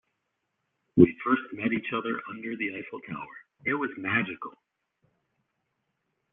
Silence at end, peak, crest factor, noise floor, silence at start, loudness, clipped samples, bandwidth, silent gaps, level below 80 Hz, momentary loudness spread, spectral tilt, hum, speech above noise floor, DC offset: 1.85 s; -4 dBFS; 28 dB; -80 dBFS; 0.95 s; -28 LUFS; under 0.1%; 3.8 kHz; none; -64 dBFS; 18 LU; -5.5 dB/octave; none; 52 dB; under 0.1%